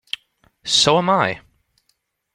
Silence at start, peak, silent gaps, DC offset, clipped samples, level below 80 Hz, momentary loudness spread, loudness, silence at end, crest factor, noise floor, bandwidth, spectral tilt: 0.65 s; -2 dBFS; none; under 0.1%; under 0.1%; -56 dBFS; 19 LU; -16 LUFS; 0.95 s; 20 dB; -69 dBFS; 16.5 kHz; -3 dB/octave